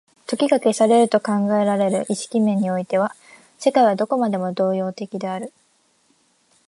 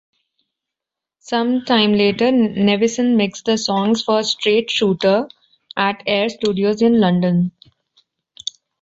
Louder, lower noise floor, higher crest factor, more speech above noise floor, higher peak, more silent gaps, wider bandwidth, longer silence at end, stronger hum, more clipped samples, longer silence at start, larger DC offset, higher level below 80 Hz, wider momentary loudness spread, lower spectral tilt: second, -20 LUFS vs -17 LUFS; second, -62 dBFS vs -85 dBFS; about the same, 18 dB vs 16 dB; second, 43 dB vs 69 dB; about the same, -4 dBFS vs -2 dBFS; neither; first, 11.5 kHz vs 8 kHz; about the same, 1.2 s vs 1.3 s; neither; neither; second, 0.3 s vs 1.25 s; neither; second, -72 dBFS vs -58 dBFS; about the same, 11 LU vs 9 LU; about the same, -5.5 dB/octave vs -5 dB/octave